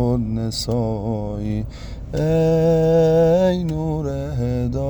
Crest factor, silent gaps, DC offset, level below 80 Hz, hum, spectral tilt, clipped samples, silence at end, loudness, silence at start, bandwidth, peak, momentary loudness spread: 12 dB; none; under 0.1%; -34 dBFS; none; -7.5 dB/octave; under 0.1%; 0 s; -20 LUFS; 0 s; over 20 kHz; -8 dBFS; 10 LU